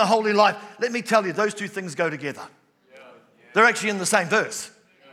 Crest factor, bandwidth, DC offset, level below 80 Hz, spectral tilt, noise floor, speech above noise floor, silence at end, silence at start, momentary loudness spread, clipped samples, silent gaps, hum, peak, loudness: 22 dB; 16 kHz; under 0.1%; -88 dBFS; -3.5 dB/octave; -51 dBFS; 29 dB; 0.45 s; 0 s; 14 LU; under 0.1%; none; none; -2 dBFS; -22 LUFS